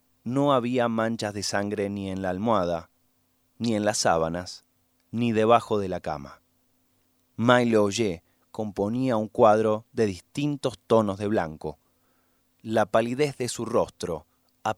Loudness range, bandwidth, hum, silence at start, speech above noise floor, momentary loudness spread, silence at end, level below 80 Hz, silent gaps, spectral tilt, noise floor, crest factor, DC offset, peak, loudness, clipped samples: 4 LU; 15.5 kHz; none; 0.25 s; 44 dB; 14 LU; 0.05 s; -58 dBFS; none; -5 dB/octave; -69 dBFS; 22 dB; under 0.1%; -4 dBFS; -25 LUFS; under 0.1%